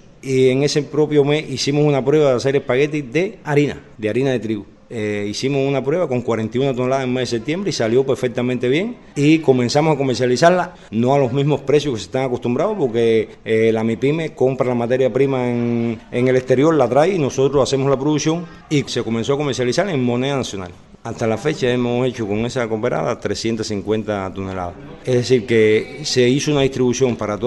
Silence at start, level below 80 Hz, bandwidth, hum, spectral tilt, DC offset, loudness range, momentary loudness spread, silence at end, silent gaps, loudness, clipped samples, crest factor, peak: 0.25 s; -48 dBFS; 11.5 kHz; none; -6 dB/octave; under 0.1%; 4 LU; 8 LU; 0 s; none; -18 LUFS; under 0.1%; 18 dB; 0 dBFS